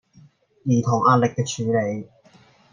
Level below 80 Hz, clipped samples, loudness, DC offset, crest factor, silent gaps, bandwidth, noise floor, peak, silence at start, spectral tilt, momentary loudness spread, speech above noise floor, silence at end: -64 dBFS; under 0.1%; -21 LUFS; under 0.1%; 18 dB; none; 9.8 kHz; -54 dBFS; -4 dBFS; 0.65 s; -6.5 dB/octave; 12 LU; 34 dB; 0.65 s